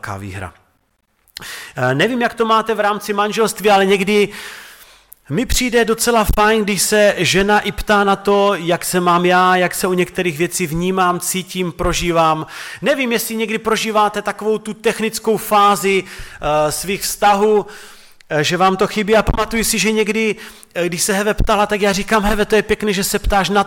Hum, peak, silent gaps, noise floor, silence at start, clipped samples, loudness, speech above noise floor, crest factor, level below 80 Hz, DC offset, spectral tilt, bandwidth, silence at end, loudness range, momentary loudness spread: none; -2 dBFS; none; -63 dBFS; 0.05 s; under 0.1%; -16 LUFS; 47 dB; 14 dB; -32 dBFS; under 0.1%; -3.5 dB/octave; 17.5 kHz; 0 s; 3 LU; 9 LU